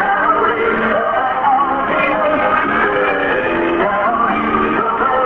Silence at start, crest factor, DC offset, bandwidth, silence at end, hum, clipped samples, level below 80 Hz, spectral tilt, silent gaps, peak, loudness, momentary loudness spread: 0 s; 12 dB; under 0.1%; 6.8 kHz; 0 s; none; under 0.1%; -42 dBFS; -7.5 dB/octave; none; -2 dBFS; -15 LUFS; 2 LU